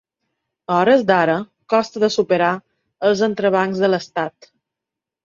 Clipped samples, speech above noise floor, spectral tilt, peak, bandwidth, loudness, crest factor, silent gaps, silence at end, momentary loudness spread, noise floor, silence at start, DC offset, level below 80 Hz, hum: under 0.1%; 68 dB; -5.5 dB/octave; -2 dBFS; 7.6 kHz; -18 LUFS; 18 dB; none; 0.95 s; 11 LU; -85 dBFS; 0.7 s; under 0.1%; -62 dBFS; none